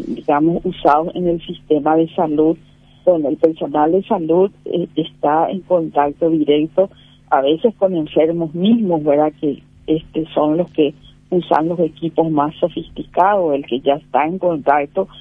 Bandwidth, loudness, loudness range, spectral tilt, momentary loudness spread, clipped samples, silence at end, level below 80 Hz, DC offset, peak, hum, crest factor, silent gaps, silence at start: 4.6 kHz; -17 LUFS; 2 LU; -9 dB/octave; 7 LU; under 0.1%; 0 s; -50 dBFS; under 0.1%; 0 dBFS; none; 16 dB; none; 0 s